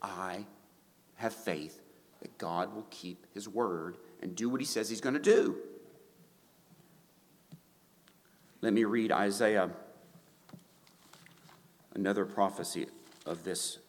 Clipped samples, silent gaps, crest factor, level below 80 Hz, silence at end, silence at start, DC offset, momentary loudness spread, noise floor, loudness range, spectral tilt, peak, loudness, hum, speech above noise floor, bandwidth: under 0.1%; none; 22 dB; -82 dBFS; 0.05 s; 0 s; under 0.1%; 18 LU; -65 dBFS; 7 LU; -4.5 dB/octave; -12 dBFS; -34 LUFS; none; 32 dB; 19 kHz